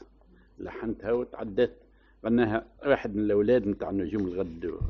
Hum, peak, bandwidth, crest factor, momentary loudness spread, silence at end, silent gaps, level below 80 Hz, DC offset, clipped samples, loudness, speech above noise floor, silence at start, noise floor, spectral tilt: none; -10 dBFS; 6.2 kHz; 18 dB; 10 LU; 0 s; none; -48 dBFS; under 0.1%; under 0.1%; -28 LUFS; 30 dB; 0 s; -58 dBFS; -6.5 dB/octave